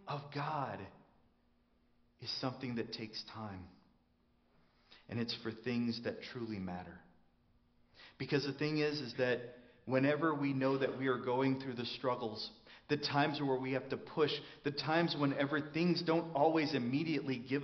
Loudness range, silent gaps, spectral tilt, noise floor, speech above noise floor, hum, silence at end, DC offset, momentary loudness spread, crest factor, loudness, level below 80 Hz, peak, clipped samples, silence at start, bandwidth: 10 LU; none; -4.5 dB/octave; -73 dBFS; 37 dB; none; 0 s; under 0.1%; 12 LU; 20 dB; -37 LUFS; -74 dBFS; -18 dBFS; under 0.1%; 0.05 s; 6.4 kHz